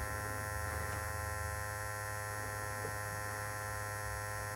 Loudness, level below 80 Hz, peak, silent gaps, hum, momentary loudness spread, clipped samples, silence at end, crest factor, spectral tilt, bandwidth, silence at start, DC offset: -40 LUFS; -50 dBFS; -26 dBFS; none; none; 1 LU; under 0.1%; 0 s; 14 dB; -3.5 dB/octave; 16 kHz; 0 s; under 0.1%